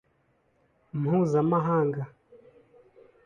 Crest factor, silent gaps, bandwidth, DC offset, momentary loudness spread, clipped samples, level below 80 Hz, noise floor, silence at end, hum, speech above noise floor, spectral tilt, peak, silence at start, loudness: 16 dB; none; 7.4 kHz; under 0.1%; 14 LU; under 0.1%; -66 dBFS; -69 dBFS; 0.9 s; none; 44 dB; -9.5 dB/octave; -12 dBFS; 0.95 s; -26 LUFS